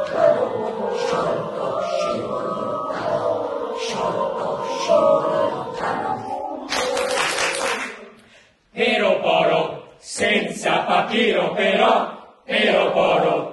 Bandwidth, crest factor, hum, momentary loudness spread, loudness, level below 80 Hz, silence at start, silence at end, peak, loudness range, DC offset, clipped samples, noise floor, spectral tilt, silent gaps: 12 kHz; 18 dB; none; 9 LU; -20 LUFS; -58 dBFS; 0 s; 0 s; -4 dBFS; 5 LU; under 0.1%; under 0.1%; -52 dBFS; -3.5 dB/octave; none